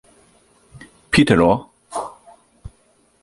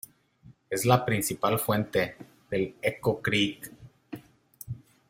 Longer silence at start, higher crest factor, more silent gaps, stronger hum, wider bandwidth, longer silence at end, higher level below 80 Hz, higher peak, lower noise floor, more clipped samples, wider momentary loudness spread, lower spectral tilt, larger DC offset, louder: first, 1.1 s vs 0.45 s; about the same, 20 dB vs 24 dB; neither; neither; second, 11.5 kHz vs 16.5 kHz; first, 0.55 s vs 0.3 s; first, -44 dBFS vs -60 dBFS; first, 0 dBFS vs -4 dBFS; about the same, -59 dBFS vs -57 dBFS; neither; second, 17 LU vs 21 LU; about the same, -5.5 dB/octave vs -4.5 dB/octave; neither; first, -18 LUFS vs -27 LUFS